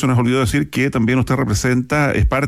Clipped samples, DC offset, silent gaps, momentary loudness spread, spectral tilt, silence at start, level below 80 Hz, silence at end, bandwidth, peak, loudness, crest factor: under 0.1%; under 0.1%; none; 2 LU; -6 dB/octave; 0 s; -28 dBFS; 0 s; 15.5 kHz; -6 dBFS; -17 LUFS; 10 dB